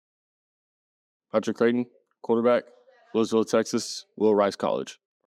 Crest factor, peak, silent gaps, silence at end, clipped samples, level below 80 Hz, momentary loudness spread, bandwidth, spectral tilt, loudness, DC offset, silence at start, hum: 18 dB; -8 dBFS; none; 0.35 s; under 0.1%; -84 dBFS; 10 LU; 13 kHz; -5 dB/octave; -25 LUFS; under 0.1%; 1.35 s; none